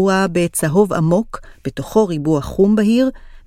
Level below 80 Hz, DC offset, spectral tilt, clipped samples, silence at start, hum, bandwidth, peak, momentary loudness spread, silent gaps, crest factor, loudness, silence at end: -40 dBFS; under 0.1%; -6 dB/octave; under 0.1%; 0 s; none; 16 kHz; -2 dBFS; 13 LU; none; 14 dB; -16 LUFS; 0.1 s